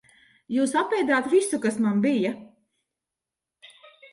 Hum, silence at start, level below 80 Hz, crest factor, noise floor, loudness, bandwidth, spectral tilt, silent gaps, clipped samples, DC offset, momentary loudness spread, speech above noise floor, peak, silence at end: none; 0.5 s; -72 dBFS; 16 dB; -88 dBFS; -24 LUFS; 11.5 kHz; -5 dB/octave; none; under 0.1%; under 0.1%; 8 LU; 65 dB; -10 dBFS; 1.65 s